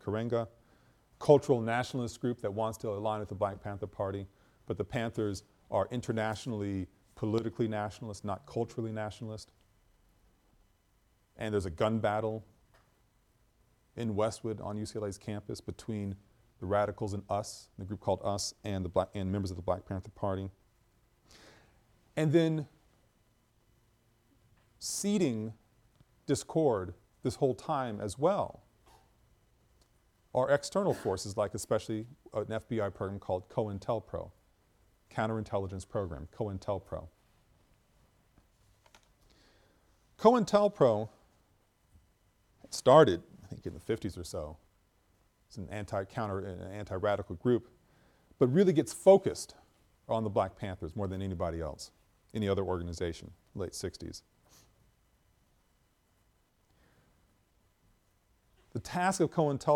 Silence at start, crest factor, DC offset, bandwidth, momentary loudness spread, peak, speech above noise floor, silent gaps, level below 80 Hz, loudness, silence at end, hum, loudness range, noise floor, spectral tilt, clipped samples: 0.05 s; 26 dB; under 0.1%; 16.5 kHz; 16 LU; -8 dBFS; 39 dB; none; -60 dBFS; -33 LUFS; 0 s; none; 10 LU; -71 dBFS; -6 dB/octave; under 0.1%